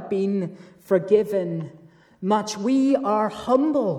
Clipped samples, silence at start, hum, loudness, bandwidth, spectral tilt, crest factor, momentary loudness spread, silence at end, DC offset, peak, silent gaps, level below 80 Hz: under 0.1%; 0 s; none; -22 LUFS; 14 kHz; -6.5 dB/octave; 16 dB; 12 LU; 0 s; under 0.1%; -6 dBFS; none; -64 dBFS